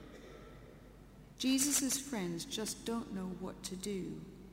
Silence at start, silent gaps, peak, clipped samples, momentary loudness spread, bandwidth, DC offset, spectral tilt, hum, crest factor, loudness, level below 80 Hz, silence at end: 0 s; none; -18 dBFS; under 0.1%; 26 LU; 16 kHz; under 0.1%; -3 dB/octave; none; 22 dB; -37 LUFS; -60 dBFS; 0 s